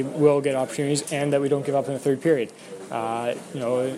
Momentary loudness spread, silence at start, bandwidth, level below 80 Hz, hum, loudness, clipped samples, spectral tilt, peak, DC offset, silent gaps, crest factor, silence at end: 10 LU; 0 s; 14.5 kHz; -70 dBFS; none; -24 LUFS; under 0.1%; -5.5 dB/octave; -6 dBFS; under 0.1%; none; 18 dB; 0 s